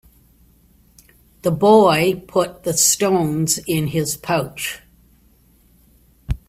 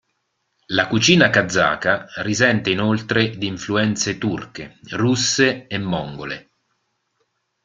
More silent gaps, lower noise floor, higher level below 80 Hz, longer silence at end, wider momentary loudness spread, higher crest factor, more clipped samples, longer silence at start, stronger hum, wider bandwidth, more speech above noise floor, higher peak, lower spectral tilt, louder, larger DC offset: neither; second, -54 dBFS vs -72 dBFS; first, -40 dBFS vs -54 dBFS; second, 0.15 s vs 1.25 s; about the same, 14 LU vs 15 LU; about the same, 20 dB vs 20 dB; neither; first, 1.45 s vs 0.7 s; neither; first, 16 kHz vs 9.4 kHz; second, 37 dB vs 52 dB; about the same, 0 dBFS vs 0 dBFS; about the same, -4 dB/octave vs -4 dB/octave; about the same, -17 LUFS vs -19 LUFS; neither